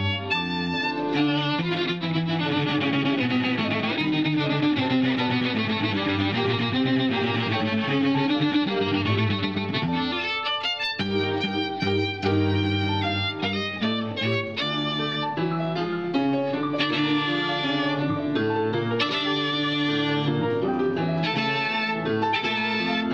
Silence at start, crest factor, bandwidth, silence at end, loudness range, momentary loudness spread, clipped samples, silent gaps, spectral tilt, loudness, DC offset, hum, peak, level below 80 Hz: 0 s; 14 dB; 7.6 kHz; 0 s; 2 LU; 3 LU; under 0.1%; none; -6.5 dB/octave; -24 LUFS; 0.1%; none; -10 dBFS; -62 dBFS